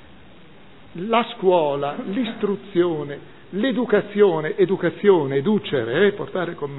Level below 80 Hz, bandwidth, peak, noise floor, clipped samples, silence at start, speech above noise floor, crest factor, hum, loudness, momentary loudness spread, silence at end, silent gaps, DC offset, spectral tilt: -62 dBFS; 4.1 kHz; -2 dBFS; -47 dBFS; under 0.1%; 0.95 s; 27 dB; 18 dB; none; -21 LUFS; 10 LU; 0 s; none; 0.5%; -10 dB/octave